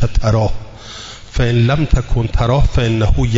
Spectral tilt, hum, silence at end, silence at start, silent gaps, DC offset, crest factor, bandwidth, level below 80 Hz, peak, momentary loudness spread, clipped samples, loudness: -7 dB/octave; none; 0 s; 0 s; none; under 0.1%; 12 dB; 7.8 kHz; -20 dBFS; -2 dBFS; 16 LU; under 0.1%; -16 LUFS